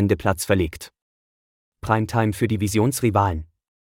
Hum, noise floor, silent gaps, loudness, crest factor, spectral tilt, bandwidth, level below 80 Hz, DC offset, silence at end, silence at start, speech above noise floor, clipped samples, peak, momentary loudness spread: none; under -90 dBFS; 1.02-1.72 s; -22 LUFS; 18 dB; -6 dB/octave; 17 kHz; -44 dBFS; under 0.1%; 0.35 s; 0 s; over 69 dB; under 0.1%; -4 dBFS; 14 LU